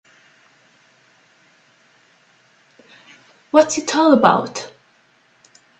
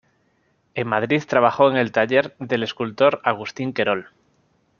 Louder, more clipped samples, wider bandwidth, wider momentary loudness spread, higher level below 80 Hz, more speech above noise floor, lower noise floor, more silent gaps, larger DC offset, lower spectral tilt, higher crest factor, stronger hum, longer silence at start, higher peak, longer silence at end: first, -16 LUFS vs -20 LUFS; neither; first, 9 kHz vs 7 kHz; first, 18 LU vs 10 LU; about the same, -64 dBFS vs -66 dBFS; about the same, 42 dB vs 45 dB; second, -57 dBFS vs -65 dBFS; neither; neither; second, -4 dB/octave vs -6 dB/octave; about the same, 22 dB vs 20 dB; neither; first, 3.55 s vs 0.75 s; about the same, 0 dBFS vs -2 dBFS; first, 1.1 s vs 0.75 s